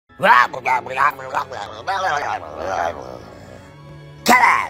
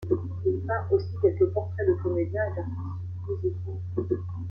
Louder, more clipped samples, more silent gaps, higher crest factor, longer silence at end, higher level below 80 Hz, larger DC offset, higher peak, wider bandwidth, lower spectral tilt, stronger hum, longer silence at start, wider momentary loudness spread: first, -18 LUFS vs -28 LUFS; neither; neither; about the same, 20 dB vs 18 dB; about the same, 0 s vs 0 s; about the same, -52 dBFS vs -54 dBFS; neither; first, 0 dBFS vs -10 dBFS; first, 16 kHz vs 5.4 kHz; second, -3 dB/octave vs -11 dB/octave; neither; first, 0.2 s vs 0 s; first, 18 LU vs 10 LU